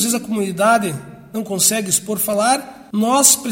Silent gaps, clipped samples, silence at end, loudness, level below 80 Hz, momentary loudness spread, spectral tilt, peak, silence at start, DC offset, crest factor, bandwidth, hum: none; under 0.1%; 0 s; -16 LUFS; -58 dBFS; 14 LU; -2.5 dB/octave; 0 dBFS; 0 s; under 0.1%; 18 dB; 16.5 kHz; none